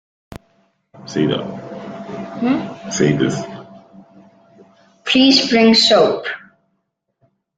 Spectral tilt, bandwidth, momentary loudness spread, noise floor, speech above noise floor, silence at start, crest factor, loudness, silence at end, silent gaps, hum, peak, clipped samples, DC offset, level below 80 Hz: -4.5 dB/octave; 9.4 kHz; 21 LU; -71 dBFS; 56 dB; 0.3 s; 18 dB; -15 LUFS; 1.2 s; none; none; 0 dBFS; under 0.1%; under 0.1%; -56 dBFS